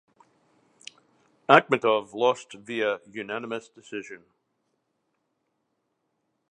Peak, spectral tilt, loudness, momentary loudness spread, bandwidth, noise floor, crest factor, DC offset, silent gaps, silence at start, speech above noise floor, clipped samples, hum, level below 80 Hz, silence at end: 0 dBFS; -4.5 dB/octave; -25 LUFS; 27 LU; 10 kHz; -77 dBFS; 28 dB; under 0.1%; none; 1.5 s; 52 dB; under 0.1%; none; -78 dBFS; 2.35 s